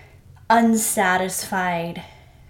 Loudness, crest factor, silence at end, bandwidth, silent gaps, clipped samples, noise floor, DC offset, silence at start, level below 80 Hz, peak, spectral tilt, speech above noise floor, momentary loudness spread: -20 LUFS; 20 dB; 0.4 s; 17 kHz; none; under 0.1%; -47 dBFS; under 0.1%; 0.5 s; -54 dBFS; -2 dBFS; -3.5 dB/octave; 27 dB; 12 LU